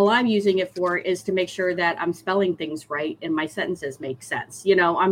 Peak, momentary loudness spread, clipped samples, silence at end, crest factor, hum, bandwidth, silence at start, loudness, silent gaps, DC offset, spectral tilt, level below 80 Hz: -6 dBFS; 10 LU; under 0.1%; 0 s; 16 dB; none; 15.5 kHz; 0 s; -23 LUFS; none; under 0.1%; -5 dB/octave; -64 dBFS